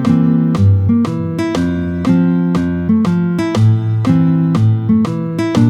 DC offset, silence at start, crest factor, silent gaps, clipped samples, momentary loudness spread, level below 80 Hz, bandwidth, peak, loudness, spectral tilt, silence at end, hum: under 0.1%; 0 s; 12 dB; none; under 0.1%; 5 LU; -42 dBFS; 10 kHz; 0 dBFS; -14 LUFS; -8.5 dB/octave; 0 s; none